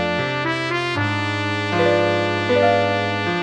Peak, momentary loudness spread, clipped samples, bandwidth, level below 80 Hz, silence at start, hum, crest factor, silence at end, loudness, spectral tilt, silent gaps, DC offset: -4 dBFS; 5 LU; under 0.1%; 10 kHz; -54 dBFS; 0 s; none; 14 dB; 0 s; -19 LUFS; -5.5 dB/octave; none; under 0.1%